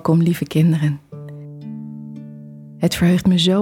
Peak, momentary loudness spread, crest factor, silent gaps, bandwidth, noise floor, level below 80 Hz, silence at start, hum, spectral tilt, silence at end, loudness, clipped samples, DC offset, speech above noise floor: -6 dBFS; 21 LU; 14 dB; none; 16 kHz; -37 dBFS; -48 dBFS; 0.05 s; none; -6.5 dB/octave; 0 s; -17 LUFS; under 0.1%; under 0.1%; 21 dB